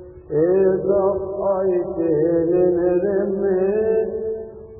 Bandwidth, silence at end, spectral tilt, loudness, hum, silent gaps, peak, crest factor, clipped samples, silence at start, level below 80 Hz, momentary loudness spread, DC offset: 2.8 kHz; 0 s; -15.5 dB/octave; -20 LUFS; none; none; -6 dBFS; 12 dB; under 0.1%; 0 s; -48 dBFS; 7 LU; under 0.1%